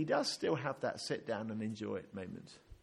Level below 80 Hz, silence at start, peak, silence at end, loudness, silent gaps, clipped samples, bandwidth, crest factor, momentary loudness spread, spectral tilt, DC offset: -70 dBFS; 0 s; -20 dBFS; 0.1 s; -39 LUFS; none; under 0.1%; 12.5 kHz; 18 dB; 13 LU; -4.5 dB/octave; under 0.1%